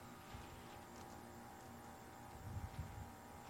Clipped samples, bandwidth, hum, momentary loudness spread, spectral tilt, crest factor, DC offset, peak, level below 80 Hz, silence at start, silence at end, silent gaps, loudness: under 0.1%; 16 kHz; none; 5 LU; -5 dB/octave; 16 dB; under 0.1%; -36 dBFS; -62 dBFS; 0 s; 0 s; none; -54 LUFS